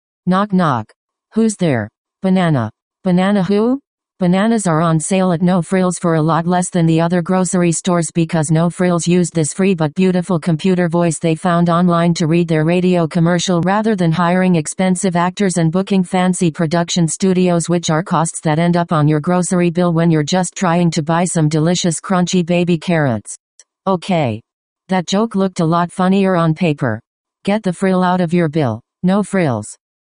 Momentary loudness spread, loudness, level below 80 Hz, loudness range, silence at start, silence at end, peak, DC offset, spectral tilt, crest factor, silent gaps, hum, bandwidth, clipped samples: 5 LU; -15 LUFS; -52 dBFS; 3 LU; 0.25 s; 0.35 s; 0 dBFS; under 0.1%; -6 dB/octave; 14 dB; 0.96-1.09 s, 1.98-2.05 s, 2.82-2.91 s, 3.87-3.98 s, 23.40-23.58 s, 24.53-24.76 s, 27.07-27.25 s; none; 10.5 kHz; under 0.1%